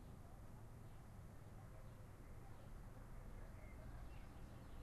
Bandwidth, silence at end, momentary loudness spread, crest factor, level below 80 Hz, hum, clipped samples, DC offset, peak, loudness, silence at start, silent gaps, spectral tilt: 13 kHz; 0 s; 2 LU; 12 dB; -58 dBFS; none; under 0.1%; under 0.1%; -44 dBFS; -60 LUFS; 0 s; none; -6.5 dB/octave